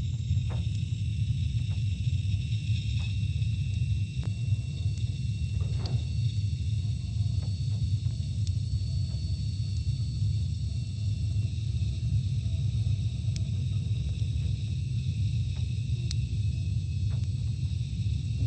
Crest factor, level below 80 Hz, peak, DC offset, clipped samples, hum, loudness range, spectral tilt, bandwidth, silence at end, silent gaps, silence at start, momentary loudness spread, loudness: 14 dB; -38 dBFS; -16 dBFS; under 0.1%; under 0.1%; none; 1 LU; -6.5 dB/octave; 8.8 kHz; 0 s; none; 0 s; 2 LU; -31 LUFS